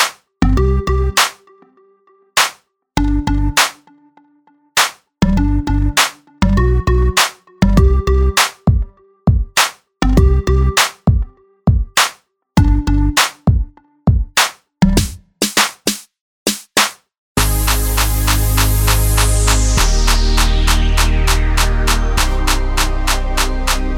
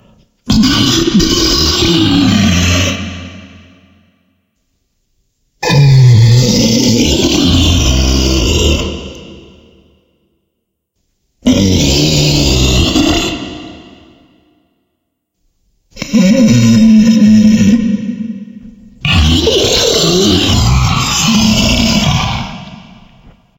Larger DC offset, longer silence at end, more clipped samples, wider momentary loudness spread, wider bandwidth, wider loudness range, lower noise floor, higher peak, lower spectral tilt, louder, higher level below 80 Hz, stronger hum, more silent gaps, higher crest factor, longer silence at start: neither; second, 0 s vs 0.8 s; neither; second, 6 LU vs 14 LU; first, over 20 kHz vs 16.5 kHz; second, 3 LU vs 8 LU; second, -54 dBFS vs -69 dBFS; about the same, 0 dBFS vs 0 dBFS; about the same, -4 dB/octave vs -4.5 dB/octave; second, -15 LUFS vs -9 LUFS; about the same, -18 dBFS vs -22 dBFS; neither; first, 16.21-16.46 s, 17.18-17.35 s vs none; about the same, 14 dB vs 12 dB; second, 0 s vs 0.45 s